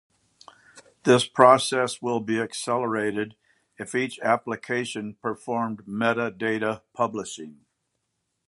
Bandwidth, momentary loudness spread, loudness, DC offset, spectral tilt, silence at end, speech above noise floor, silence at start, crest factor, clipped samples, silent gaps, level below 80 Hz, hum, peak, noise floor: 11.5 kHz; 15 LU; -24 LUFS; under 0.1%; -4.5 dB/octave; 0.95 s; 53 dB; 0.75 s; 24 dB; under 0.1%; none; -70 dBFS; none; 0 dBFS; -78 dBFS